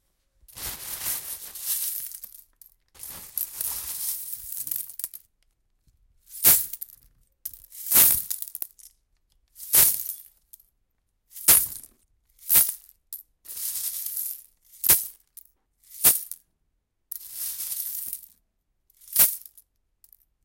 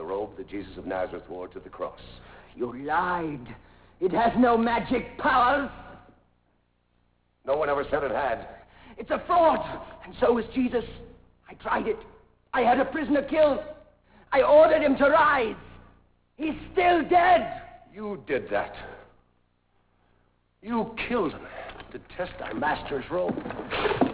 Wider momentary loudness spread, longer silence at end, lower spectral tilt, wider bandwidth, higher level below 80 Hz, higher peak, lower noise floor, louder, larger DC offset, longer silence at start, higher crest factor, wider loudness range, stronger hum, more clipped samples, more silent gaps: first, 23 LU vs 20 LU; first, 1.05 s vs 0 s; second, 0.5 dB/octave vs -9 dB/octave; first, 17 kHz vs 4 kHz; second, -58 dBFS vs -52 dBFS; first, -2 dBFS vs -8 dBFS; first, -74 dBFS vs -69 dBFS; first, -22 LUFS vs -25 LUFS; neither; first, 0.55 s vs 0 s; first, 26 dB vs 20 dB; about the same, 10 LU vs 11 LU; second, none vs 60 Hz at -55 dBFS; neither; neither